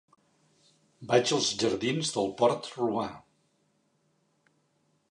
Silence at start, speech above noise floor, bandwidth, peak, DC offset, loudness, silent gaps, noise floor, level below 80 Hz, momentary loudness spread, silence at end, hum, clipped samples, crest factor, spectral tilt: 1 s; 44 dB; 11.5 kHz; -10 dBFS; under 0.1%; -28 LUFS; none; -72 dBFS; -68 dBFS; 8 LU; 1.9 s; none; under 0.1%; 22 dB; -4 dB/octave